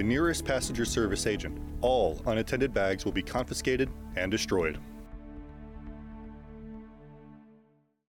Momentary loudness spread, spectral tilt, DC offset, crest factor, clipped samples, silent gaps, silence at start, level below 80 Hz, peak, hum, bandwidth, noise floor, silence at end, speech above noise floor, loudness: 19 LU; -4.5 dB/octave; under 0.1%; 16 dB; under 0.1%; none; 0 s; -44 dBFS; -16 dBFS; none; 18 kHz; -66 dBFS; 0.6 s; 36 dB; -30 LUFS